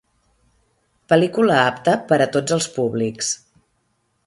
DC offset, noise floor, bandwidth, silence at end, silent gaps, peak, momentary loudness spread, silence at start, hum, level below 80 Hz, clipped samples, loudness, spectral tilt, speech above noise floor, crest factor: under 0.1%; -68 dBFS; 11.5 kHz; 0.9 s; none; 0 dBFS; 7 LU; 1.1 s; none; -62 dBFS; under 0.1%; -19 LUFS; -4.5 dB/octave; 50 dB; 20 dB